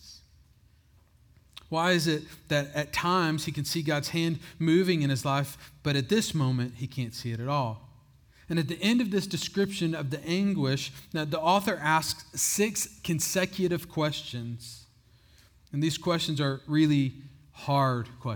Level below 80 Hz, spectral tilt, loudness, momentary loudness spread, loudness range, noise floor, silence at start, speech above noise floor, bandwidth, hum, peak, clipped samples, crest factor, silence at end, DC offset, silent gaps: -60 dBFS; -4.5 dB/octave; -28 LUFS; 9 LU; 3 LU; -61 dBFS; 0.05 s; 33 dB; over 20 kHz; none; -10 dBFS; under 0.1%; 18 dB; 0 s; under 0.1%; none